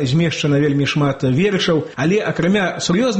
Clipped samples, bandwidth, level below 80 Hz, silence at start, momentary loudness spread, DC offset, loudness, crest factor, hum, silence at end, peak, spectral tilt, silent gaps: under 0.1%; 8.6 kHz; -48 dBFS; 0 s; 2 LU; under 0.1%; -17 LUFS; 10 dB; none; 0 s; -6 dBFS; -5.5 dB/octave; none